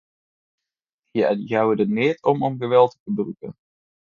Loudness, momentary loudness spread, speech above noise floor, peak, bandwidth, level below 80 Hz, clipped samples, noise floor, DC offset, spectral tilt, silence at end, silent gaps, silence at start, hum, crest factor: -21 LUFS; 12 LU; 63 dB; -2 dBFS; 7 kHz; -66 dBFS; under 0.1%; -84 dBFS; under 0.1%; -8 dB/octave; 0.65 s; 3.00-3.06 s; 1.15 s; none; 20 dB